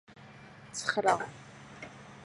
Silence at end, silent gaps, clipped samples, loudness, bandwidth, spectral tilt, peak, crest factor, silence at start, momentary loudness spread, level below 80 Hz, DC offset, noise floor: 0 s; none; under 0.1%; -32 LUFS; 11.5 kHz; -3 dB/octave; -10 dBFS; 24 dB; 0.1 s; 23 LU; -70 dBFS; under 0.1%; -52 dBFS